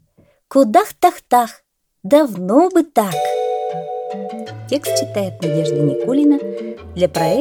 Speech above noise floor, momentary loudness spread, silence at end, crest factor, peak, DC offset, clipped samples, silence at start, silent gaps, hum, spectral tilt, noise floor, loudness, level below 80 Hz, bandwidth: 40 dB; 13 LU; 0 s; 16 dB; 0 dBFS; under 0.1%; under 0.1%; 0.5 s; none; none; -6 dB/octave; -55 dBFS; -17 LUFS; -56 dBFS; over 20 kHz